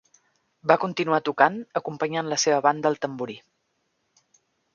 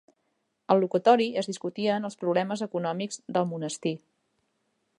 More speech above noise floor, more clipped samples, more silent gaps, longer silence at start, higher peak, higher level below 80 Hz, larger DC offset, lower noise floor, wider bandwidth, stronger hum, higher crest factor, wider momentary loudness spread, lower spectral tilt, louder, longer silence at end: about the same, 50 dB vs 50 dB; neither; neither; about the same, 0.65 s vs 0.7 s; first, -2 dBFS vs -6 dBFS; first, -74 dBFS vs -80 dBFS; neither; about the same, -74 dBFS vs -76 dBFS; second, 7.2 kHz vs 11 kHz; neither; about the same, 24 dB vs 22 dB; about the same, 10 LU vs 11 LU; second, -3.5 dB/octave vs -5.5 dB/octave; first, -24 LUFS vs -27 LUFS; first, 1.35 s vs 1 s